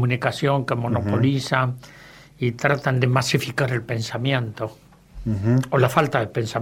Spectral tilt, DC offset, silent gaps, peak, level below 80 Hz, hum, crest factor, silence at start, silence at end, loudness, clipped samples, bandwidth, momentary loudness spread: -6 dB/octave; under 0.1%; none; -2 dBFS; -50 dBFS; none; 20 dB; 0 s; 0 s; -22 LUFS; under 0.1%; 16 kHz; 8 LU